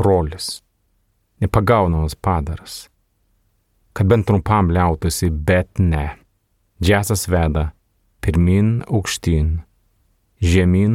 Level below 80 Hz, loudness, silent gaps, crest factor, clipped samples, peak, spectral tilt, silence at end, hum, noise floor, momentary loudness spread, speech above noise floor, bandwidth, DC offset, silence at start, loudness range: -30 dBFS; -18 LUFS; none; 18 dB; under 0.1%; 0 dBFS; -6 dB/octave; 0 s; none; -64 dBFS; 12 LU; 48 dB; 16 kHz; under 0.1%; 0 s; 3 LU